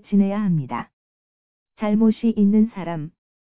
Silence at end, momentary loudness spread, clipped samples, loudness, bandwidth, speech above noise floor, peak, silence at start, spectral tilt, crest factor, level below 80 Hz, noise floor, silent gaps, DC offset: 0.3 s; 14 LU; under 0.1%; -21 LUFS; 4 kHz; over 71 dB; -8 dBFS; 0 s; -12.5 dB/octave; 14 dB; -60 dBFS; under -90 dBFS; 0.93-1.66 s; 0.8%